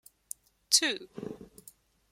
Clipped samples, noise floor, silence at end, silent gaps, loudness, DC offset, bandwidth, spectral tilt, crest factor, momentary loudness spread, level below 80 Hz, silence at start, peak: under 0.1%; -59 dBFS; 0.65 s; none; -27 LUFS; under 0.1%; 16.5 kHz; 0 dB/octave; 26 dB; 21 LU; -72 dBFS; 0.7 s; -8 dBFS